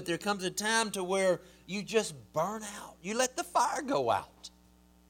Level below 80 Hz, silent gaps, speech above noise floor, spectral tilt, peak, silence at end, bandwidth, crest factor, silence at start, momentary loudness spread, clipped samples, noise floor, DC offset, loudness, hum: -66 dBFS; none; 29 dB; -3 dB/octave; -14 dBFS; 0.6 s; 18 kHz; 20 dB; 0 s; 12 LU; under 0.1%; -62 dBFS; under 0.1%; -32 LUFS; none